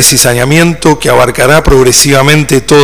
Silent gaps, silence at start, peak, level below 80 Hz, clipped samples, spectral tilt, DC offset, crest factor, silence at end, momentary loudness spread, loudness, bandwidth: none; 0 s; 0 dBFS; -22 dBFS; 7%; -3.5 dB/octave; 7%; 6 dB; 0 s; 3 LU; -5 LUFS; over 20 kHz